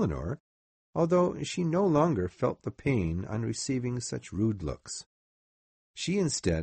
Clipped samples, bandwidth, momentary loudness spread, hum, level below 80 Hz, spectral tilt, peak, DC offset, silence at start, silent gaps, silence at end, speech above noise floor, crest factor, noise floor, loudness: under 0.1%; 8.8 kHz; 13 LU; none; -50 dBFS; -6 dB/octave; -12 dBFS; under 0.1%; 0 s; 0.40-0.93 s, 5.06-5.94 s; 0 s; over 61 dB; 18 dB; under -90 dBFS; -30 LUFS